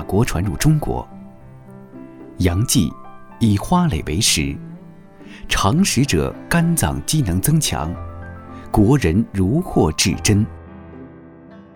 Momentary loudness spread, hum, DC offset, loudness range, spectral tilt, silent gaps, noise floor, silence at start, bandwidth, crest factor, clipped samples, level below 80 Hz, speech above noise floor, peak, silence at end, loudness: 22 LU; none; under 0.1%; 3 LU; -5 dB/octave; none; -41 dBFS; 0 s; over 20 kHz; 16 dB; under 0.1%; -34 dBFS; 24 dB; -4 dBFS; 0.15 s; -18 LUFS